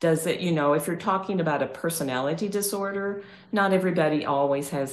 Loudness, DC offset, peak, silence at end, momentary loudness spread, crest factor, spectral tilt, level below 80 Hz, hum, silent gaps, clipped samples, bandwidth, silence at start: -25 LUFS; under 0.1%; -10 dBFS; 0 s; 6 LU; 16 dB; -5 dB/octave; -68 dBFS; none; none; under 0.1%; 12.5 kHz; 0 s